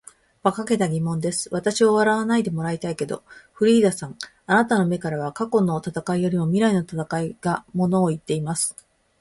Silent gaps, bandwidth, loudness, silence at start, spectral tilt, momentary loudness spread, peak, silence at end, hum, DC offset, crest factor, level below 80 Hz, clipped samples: none; 11.5 kHz; -22 LUFS; 0.45 s; -5.5 dB/octave; 9 LU; -4 dBFS; 0.5 s; none; under 0.1%; 18 dB; -58 dBFS; under 0.1%